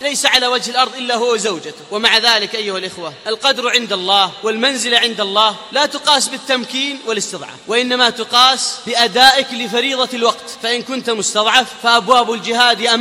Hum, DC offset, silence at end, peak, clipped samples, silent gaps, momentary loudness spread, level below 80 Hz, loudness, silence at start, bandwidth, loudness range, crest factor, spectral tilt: none; under 0.1%; 0 s; 0 dBFS; under 0.1%; none; 10 LU; -60 dBFS; -14 LUFS; 0 s; 17 kHz; 2 LU; 16 dB; -1 dB/octave